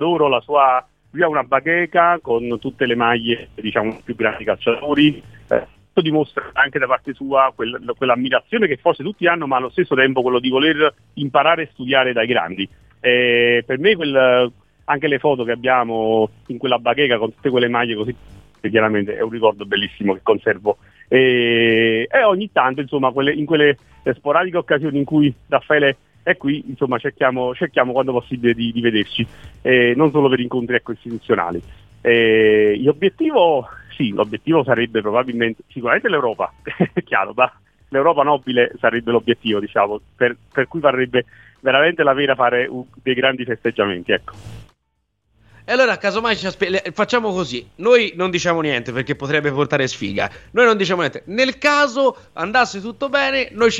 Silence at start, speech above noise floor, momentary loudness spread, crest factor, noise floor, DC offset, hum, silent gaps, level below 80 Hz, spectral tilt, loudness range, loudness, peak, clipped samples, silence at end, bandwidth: 0 s; 53 dB; 8 LU; 18 dB; -71 dBFS; under 0.1%; none; none; -52 dBFS; -5.5 dB/octave; 3 LU; -17 LUFS; 0 dBFS; under 0.1%; 0 s; 8 kHz